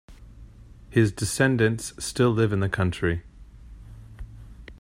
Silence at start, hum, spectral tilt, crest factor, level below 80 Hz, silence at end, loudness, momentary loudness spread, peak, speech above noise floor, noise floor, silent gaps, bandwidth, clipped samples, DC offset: 0.1 s; none; -5.5 dB/octave; 20 dB; -46 dBFS; 0.05 s; -24 LUFS; 24 LU; -6 dBFS; 23 dB; -46 dBFS; none; 15.5 kHz; under 0.1%; under 0.1%